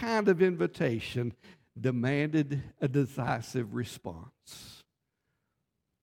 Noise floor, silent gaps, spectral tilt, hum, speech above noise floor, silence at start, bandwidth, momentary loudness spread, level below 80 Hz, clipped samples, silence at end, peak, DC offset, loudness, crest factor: -82 dBFS; none; -7 dB/octave; none; 52 dB; 0 s; 16.5 kHz; 21 LU; -64 dBFS; under 0.1%; 1.25 s; -12 dBFS; under 0.1%; -31 LUFS; 20 dB